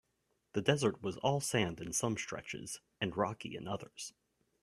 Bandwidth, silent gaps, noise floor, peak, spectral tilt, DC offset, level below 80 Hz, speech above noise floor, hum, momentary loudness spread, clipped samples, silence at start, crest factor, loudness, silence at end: 15.5 kHz; none; -80 dBFS; -14 dBFS; -4 dB/octave; under 0.1%; -68 dBFS; 44 dB; none; 12 LU; under 0.1%; 0.55 s; 24 dB; -36 LUFS; 0.5 s